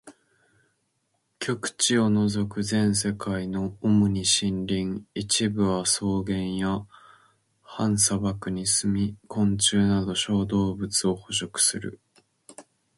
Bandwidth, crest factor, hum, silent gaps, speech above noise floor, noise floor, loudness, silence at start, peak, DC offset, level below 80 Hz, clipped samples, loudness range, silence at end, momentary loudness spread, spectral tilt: 11.5 kHz; 18 dB; none; none; 49 dB; -74 dBFS; -25 LUFS; 0.05 s; -8 dBFS; under 0.1%; -50 dBFS; under 0.1%; 3 LU; 0.35 s; 8 LU; -4 dB/octave